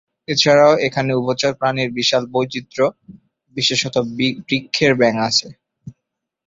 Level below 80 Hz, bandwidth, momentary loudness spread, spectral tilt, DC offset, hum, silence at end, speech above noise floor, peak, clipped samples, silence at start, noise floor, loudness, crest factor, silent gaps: -56 dBFS; 7.8 kHz; 8 LU; -4 dB/octave; under 0.1%; none; 0.55 s; 62 dB; -2 dBFS; under 0.1%; 0.3 s; -79 dBFS; -17 LUFS; 18 dB; none